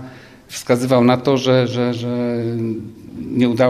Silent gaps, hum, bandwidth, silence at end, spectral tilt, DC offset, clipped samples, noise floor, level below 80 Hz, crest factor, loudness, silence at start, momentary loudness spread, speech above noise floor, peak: none; none; 14 kHz; 0 s; -6.5 dB/octave; under 0.1%; under 0.1%; -39 dBFS; -54 dBFS; 14 dB; -18 LUFS; 0 s; 17 LU; 22 dB; -2 dBFS